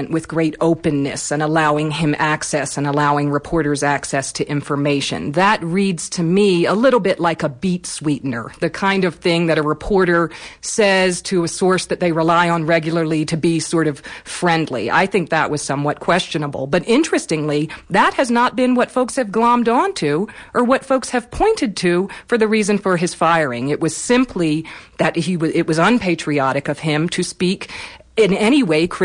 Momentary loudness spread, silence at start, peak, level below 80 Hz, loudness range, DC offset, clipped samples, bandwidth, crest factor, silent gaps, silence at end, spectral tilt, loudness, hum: 7 LU; 0 s; -4 dBFS; -46 dBFS; 2 LU; under 0.1%; under 0.1%; 10.5 kHz; 14 dB; none; 0 s; -5 dB/octave; -17 LUFS; none